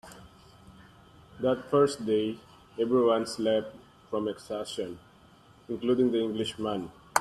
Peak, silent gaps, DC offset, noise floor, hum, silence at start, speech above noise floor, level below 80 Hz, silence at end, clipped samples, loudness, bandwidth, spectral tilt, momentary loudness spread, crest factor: -6 dBFS; none; under 0.1%; -57 dBFS; none; 0.05 s; 29 dB; -64 dBFS; 0 s; under 0.1%; -29 LUFS; 13 kHz; -5 dB/octave; 15 LU; 24 dB